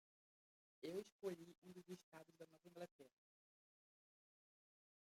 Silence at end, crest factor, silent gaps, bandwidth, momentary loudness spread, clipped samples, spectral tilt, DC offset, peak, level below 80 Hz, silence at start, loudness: 2.05 s; 24 dB; 1.12-1.19 s, 1.58-1.62 s, 2.03-2.12 s, 2.91-2.99 s; 16 kHz; 12 LU; under 0.1%; -5.5 dB/octave; under 0.1%; -36 dBFS; under -90 dBFS; 0.8 s; -57 LUFS